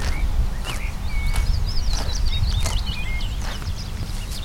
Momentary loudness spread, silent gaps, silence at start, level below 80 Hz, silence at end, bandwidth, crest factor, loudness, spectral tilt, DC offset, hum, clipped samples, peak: 7 LU; none; 0 s; -24 dBFS; 0 s; 16 kHz; 14 dB; -26 LUFS; -4 dB/octave; under 0.1%; none; under 0.1%; -8 dBFS